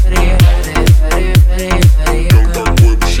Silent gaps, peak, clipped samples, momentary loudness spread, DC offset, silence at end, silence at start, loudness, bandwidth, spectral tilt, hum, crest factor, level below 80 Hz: none; 0 dBFS; 0.3%; 3 LU; under 0.1%; 0 s; 0 s; -11 LUFS; 16.5 kHz; -5.5 dB/octave; none; 8 dB; -10 dBFS